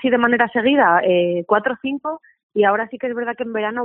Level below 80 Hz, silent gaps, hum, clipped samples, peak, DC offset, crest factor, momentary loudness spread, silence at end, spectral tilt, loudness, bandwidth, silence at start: -62 dBFS; 2.43-2.49 s; none; under 0.1%; 0 dBFS; under 0.1%; 18 dB; 11 LU; 0 s; -3 dB/octave; -18 LUFS; 3.9 kHz; 0 s